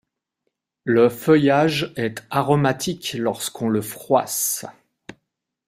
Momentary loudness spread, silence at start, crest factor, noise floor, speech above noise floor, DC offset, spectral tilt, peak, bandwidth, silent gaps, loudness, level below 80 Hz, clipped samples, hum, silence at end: 10 LU; 0.85 s; 18 dB; -77 dBFS; 57 dB; under 0.1%; -4.5 dB/octave; -4 dBFS; 16 kHz; none; -20 LUFS; -60 dBFS; under 0.1%; none; 0.95 s